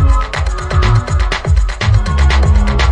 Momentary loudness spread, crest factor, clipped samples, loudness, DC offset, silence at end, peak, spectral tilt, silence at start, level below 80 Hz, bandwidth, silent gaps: 4 LU; 10 dB; under 0.1%; -14 LUFS; under 0.1%; 0 s; 0 dBFS; -5.5 dB/octave; 0 s; -12 dBFS; 9.8 kHz; none